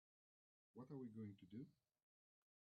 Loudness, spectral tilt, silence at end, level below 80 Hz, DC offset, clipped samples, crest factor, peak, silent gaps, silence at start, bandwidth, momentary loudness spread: -58 LUFS; -9 dB/octave; 1.05 s; under -90 dBFS; under 0.1%; under 0.1%; 16 dB; -44 dBFS; none; 0.75 s; 4.8 kHz; 9 LU